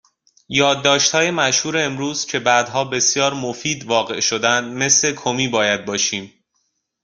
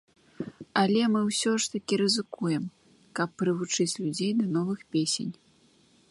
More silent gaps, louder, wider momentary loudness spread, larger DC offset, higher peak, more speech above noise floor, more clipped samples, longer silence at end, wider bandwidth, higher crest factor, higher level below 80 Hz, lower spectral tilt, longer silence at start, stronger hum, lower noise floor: neither; first, -17 LUFS vs -28 LUFS; second, 7 LU vs 14 LU; neither; first, -2 dBFS vs -10 dBFS; first, 51 dB vs 35 dB; neither; about the same, 0.75 s vs 0.8 s; about the same, 11 kHz vs 11.5 kHz; about the same, 18 dB vs 18 dB; first, -60 dBFS vs -70 dBFS; second, -2 dB/octave vs -4 dB/octave; about the same, 0.5 s vs 0.4 s; neither; first, -70 dBFS vs -62 dBFS